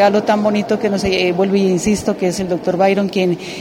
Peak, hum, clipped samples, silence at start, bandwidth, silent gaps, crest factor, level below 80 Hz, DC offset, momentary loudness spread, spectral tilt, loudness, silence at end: -2 dBFS; none; under 0.1%; 0 s; 16 kHz; none; 14 dB; -44 dBFS; under 0.1%; 4 LU; -5.5 dB/octave; -16 LUFS; 0 s